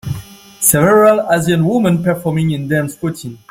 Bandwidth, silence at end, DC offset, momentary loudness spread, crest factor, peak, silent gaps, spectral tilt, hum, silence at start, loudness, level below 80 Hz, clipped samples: 16.5 kHz; 0.15 s; under 0.1%; 14 LU; 14 dB; 0 dBFS; none; -5.5 dB/octave; none; 0.05 s; -13 LUFS; -46 dBFS; under 0.1%